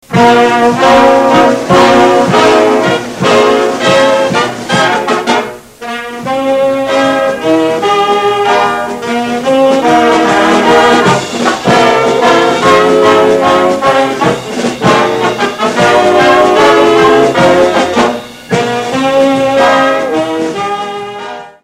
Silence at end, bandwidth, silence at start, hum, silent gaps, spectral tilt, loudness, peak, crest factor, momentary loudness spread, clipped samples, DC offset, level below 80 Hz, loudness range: 0.15 s; 16 kHz; 0.1 s; none; none; -4.5 dB/octave; -8 LUFS; 0 dBFS; 8 dB; 9 LU; 1%; under 0.1%; -42 dBFS; 4 LU